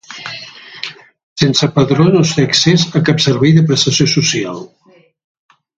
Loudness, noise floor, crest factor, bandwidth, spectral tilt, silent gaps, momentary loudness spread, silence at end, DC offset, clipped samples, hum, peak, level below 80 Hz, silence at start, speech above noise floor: -11 LUFS; -32 dBFS; 14 dB; 8.8 kHz; -5 dB/octave; 1.23-1.36 s; 17 LU; 1.1 s; under 0.1%; under 0.1%; none; 0 dBFS; -48 dBFS; 0.1 s; 21 dB